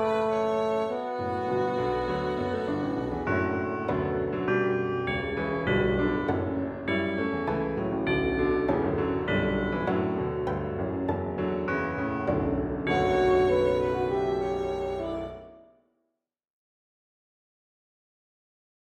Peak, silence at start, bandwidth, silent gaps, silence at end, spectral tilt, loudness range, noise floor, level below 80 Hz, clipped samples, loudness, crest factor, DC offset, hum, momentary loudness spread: -12 dBFS; 0 s; 8.6 kHz; none; 3.2 s; -7.5 dB/octave; 4 LU; -82 dBFS; -46 dBFS; under 0.1%; -28 LUFS; 16 dB; under 0.1%; none; 6 LU